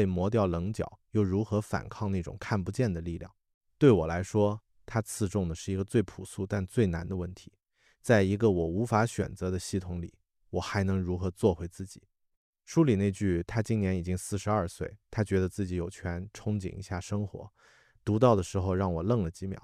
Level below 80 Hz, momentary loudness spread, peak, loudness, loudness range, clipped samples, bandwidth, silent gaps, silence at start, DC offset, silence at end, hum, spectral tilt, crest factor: -52 dBFS; 13 LU; -10 dBFS; -30 LUFS; 4 LU; under 0.1%; 14 kHz; 3.54-3.61 s, 12.37-12.53 s; 0 s; under 0.1%; 0.05 s; none; -7 dB/octave; 20 dB